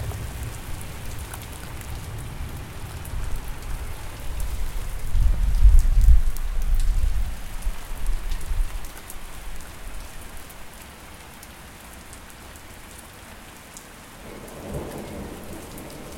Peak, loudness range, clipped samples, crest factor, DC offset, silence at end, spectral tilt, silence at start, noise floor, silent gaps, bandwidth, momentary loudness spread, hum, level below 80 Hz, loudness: -2 dBFS; 17 LU; under 0.1%; 20 dB; under 0.1%; 0 s; -5 dB/octave; 0 s; -42 dBFS; none; 16.5 kHz; 19 LU; none; -26 dBFS; -30 LUFS